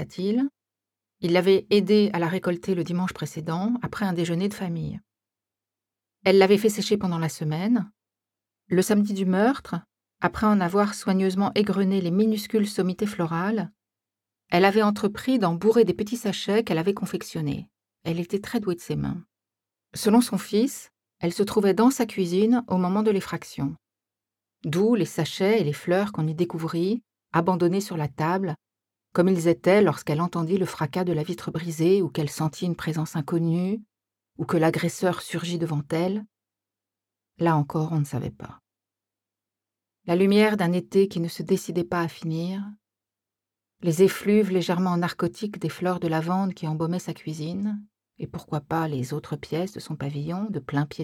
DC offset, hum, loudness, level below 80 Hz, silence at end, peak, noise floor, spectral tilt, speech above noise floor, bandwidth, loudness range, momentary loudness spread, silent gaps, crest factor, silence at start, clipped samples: under 0.1%; none; -25 LUFS; -60 dBFS; 0 s; -4 dBFS; -89 dBFS; -6.5 dB/octave; 65 dB; 16.5 kHz; 5 LU; 12 LU; none; 20 dB; 0 s; under 0.1%